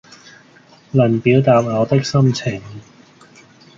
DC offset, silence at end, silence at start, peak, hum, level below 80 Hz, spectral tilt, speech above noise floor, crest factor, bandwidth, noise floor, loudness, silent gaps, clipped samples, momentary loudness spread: under 0.1%; 0.95 s; 0.95 s; -2 dBFS; none; -52 dBFS; -7 dB/octave; 33 dB; 16 dB; 7.4 kHz; -48 dBFS; -16 LUFS; none; under 0.1%; 12 LU